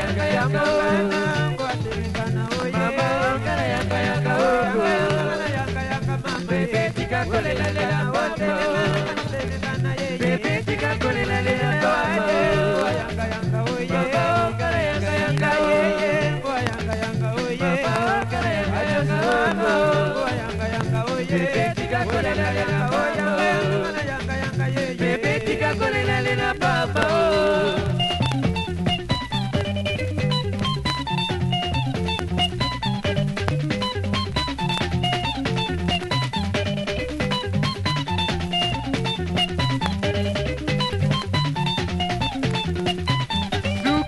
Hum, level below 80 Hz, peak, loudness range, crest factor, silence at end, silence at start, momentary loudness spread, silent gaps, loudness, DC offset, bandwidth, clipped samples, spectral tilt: none; -40 dBFS; -2 dBFS; 2 LU; 20 dB; 0 s; 0 s; 5 LU; none; -22 LUFS; under 0.1%; 11.5 kHz; under 0.1%; -5.5 dB/octave